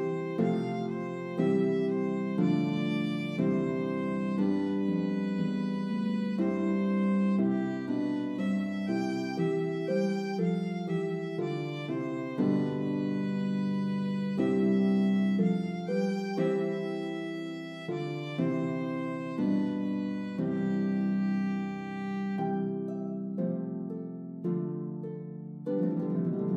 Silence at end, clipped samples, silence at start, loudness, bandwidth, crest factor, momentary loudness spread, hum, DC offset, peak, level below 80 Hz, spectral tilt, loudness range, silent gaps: 0 s; under 0.1%; 0 s; -31 LUFS; 8.2 kHz; 14 dB; 8 LU; none; under 0.1%; -16 dBFS; -78 dBFS; -8.5 dB/octave; 4 LU; none